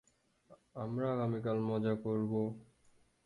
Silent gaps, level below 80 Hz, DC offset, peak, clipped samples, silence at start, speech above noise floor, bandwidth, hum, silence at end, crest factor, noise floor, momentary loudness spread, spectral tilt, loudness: none; -70 dBFS; under 0.1%; -22 dBFS; under 0.1%; 0.5 s; 33 dB; 9.8 kHz; none; 0.65 s; 16 dB; -69 dBFS; 10 LU; -9.5 dB/octave; -36 LUFS